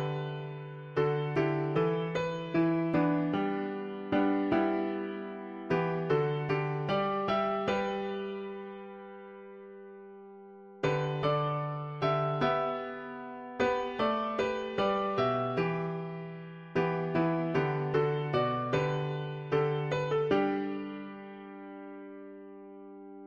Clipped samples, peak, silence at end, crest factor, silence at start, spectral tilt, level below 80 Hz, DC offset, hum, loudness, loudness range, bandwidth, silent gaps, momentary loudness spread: under 0.1%; -16 dBFS; 0 s; 16 dB; 0 s; -7.5 dB/octave; -62 dBFS; under 0.1%; none; -31 LUFS; 5 LU; 7 kHz; none; 18 LU